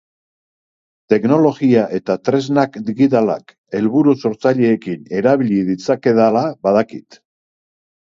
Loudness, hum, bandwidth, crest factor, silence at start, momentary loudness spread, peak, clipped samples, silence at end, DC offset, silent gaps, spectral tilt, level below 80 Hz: -16 LUFS; none; 7.6 kHz; 16 dB; 1.1 s; 7 LU; 0 dBFS; under 0.1%; 1.15 s; under 0.1%; 3.58-3.64 s; -7.5 dB/octave; -60 dBFS